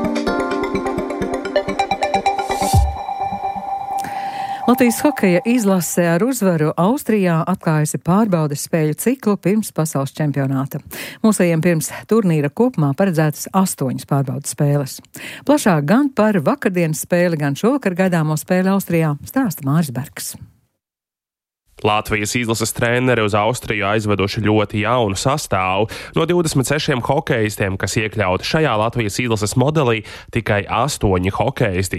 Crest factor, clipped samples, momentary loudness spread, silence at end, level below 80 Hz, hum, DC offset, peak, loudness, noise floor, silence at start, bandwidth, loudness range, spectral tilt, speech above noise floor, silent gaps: 16 dB; under 0.1%; 7 LU; 0 s; -38 dBFS; none; under 0.1%; -2 dBFS; -18 LUFS; -89 dBFS; 0 s; 16.5 kHz; 3 LU; -5.5 dB/octave; 72 dB; none